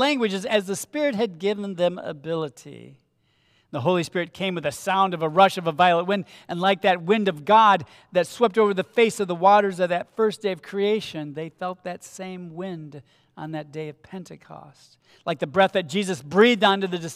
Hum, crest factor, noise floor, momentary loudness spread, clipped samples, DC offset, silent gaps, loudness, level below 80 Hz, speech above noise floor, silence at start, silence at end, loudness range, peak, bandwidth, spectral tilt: none; 20 dB; -66 dBFS; 17 LU; under 0.1%; under 0.1%; none; -22 LUFS; -70 dBFS; 43 dB; 0 s; 0 s; 14 LU; -4 dBFS; 15.5 kHz; -5 dB/octave